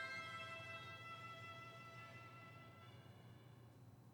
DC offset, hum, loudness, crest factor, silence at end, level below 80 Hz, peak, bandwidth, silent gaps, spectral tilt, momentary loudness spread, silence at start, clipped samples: under 0.1%; none; -55 LUFS; 16 dB; 0 s; -84 dBFS; -38 dBFS; 19 kHz; none; -4 dB/octave; 13 LU; 0 s; under 0.1%